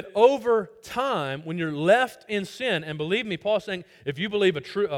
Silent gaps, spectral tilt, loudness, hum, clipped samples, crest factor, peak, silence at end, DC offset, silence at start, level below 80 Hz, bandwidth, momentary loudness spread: none; -5.5 dB/octave; -25 LUFS; none; under 0.1%; 20 dB; -6 dBFS; 0 s; under 0.1%; 0 s; -64 dBFS; 16 kHz; 10 LU